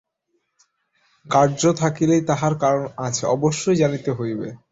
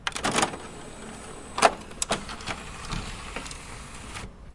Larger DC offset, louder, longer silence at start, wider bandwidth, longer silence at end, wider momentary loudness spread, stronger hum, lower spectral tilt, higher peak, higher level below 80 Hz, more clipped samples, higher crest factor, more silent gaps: neither; first, -20 LUFS vs -29 LUFS; first, 1.25 s vs 0 s; second, 8 kHz vs 11.5 kHz; first, 0.15 s vs 0 s; second, 7 LU vs 17 LU; neither; first, -5.5 dB/octave vs -2.5 dB/octave; about the same, -4 dBFS vs -2 dBFS; second, -56 dBFS vs -44 dBFS; neither; second, 18 dB vs 28 dB; neither